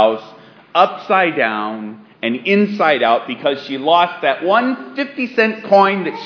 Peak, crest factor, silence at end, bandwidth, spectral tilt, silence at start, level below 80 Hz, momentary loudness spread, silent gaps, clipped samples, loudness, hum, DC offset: 0 dBFS; 16 dB; 0 s; 5.4 kHz; -6.5 dB/octave; 0 s; -78 dBFS; 10 LU; none; under 0.1%; -16 LUFS; none; under 0.1%